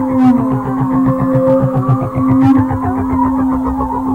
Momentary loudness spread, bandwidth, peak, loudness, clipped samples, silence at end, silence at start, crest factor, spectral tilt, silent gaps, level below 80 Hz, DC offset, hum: 5 LU; 3.9 kHz; -2 dBFS; -13 LUFS; under 0.1%; 0 s; 0 s; 12 dB; -10.5 dB/octave; none; -32 dBFS; 0.1%; none